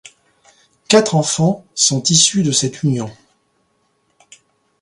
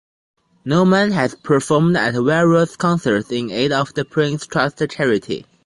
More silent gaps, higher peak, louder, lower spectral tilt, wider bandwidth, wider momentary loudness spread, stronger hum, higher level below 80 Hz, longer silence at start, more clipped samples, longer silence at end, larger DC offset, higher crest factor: neither; about the same, 0 dBFS vs -2 dBFS; first, -14 LUFS vs -17 LUFS; second, -3.5 dB/octave vs -6 dB/octave; about the same, 11.5 kHz vs 11.5 kHz; about the same, 8 LU vs 6 LU; neither; about the same, -58 dBFS vs -54 dBFS; first, 0.9 s vs 0.65 s; neither; first, 1.7 s vs 0.25 s; neither; about the same, 18 dB vs 16 dB